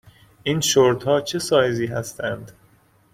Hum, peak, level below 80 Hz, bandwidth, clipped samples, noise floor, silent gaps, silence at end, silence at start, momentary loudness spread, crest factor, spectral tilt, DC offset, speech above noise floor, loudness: none; -4 dBFS; -56 dBFS; 16.5 kHz; under 0.1%; -57 dBFS; none; 0.6 s; 0.45 s; 12 LU; 18 dB; -4 dB/octave; under 0.1%; 36 dB; -21 LUFS